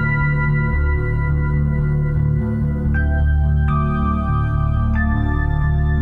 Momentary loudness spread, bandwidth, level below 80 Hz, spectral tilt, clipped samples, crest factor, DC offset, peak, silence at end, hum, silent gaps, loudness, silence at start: 2 LU; 4.2 kHz; -20 dBFS; -10.5 dB/octave; under 0.1%; 10 dB; under 0.1%; -8 dBFS; 0 s; none; none; -19 LUFS; 0 s